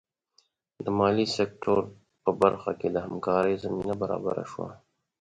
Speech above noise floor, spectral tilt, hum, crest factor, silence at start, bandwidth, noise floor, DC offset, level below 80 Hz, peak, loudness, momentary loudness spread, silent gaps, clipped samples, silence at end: 41 dB; -6 dB/octave; none; 20 dB; 0.8 s; 10.5 kHz; -68 dBFS; under 0.1%; -60 dBFS; -8 dBFS; -28 LUFS; 13 LU; none; under 0.1%; 0.45 s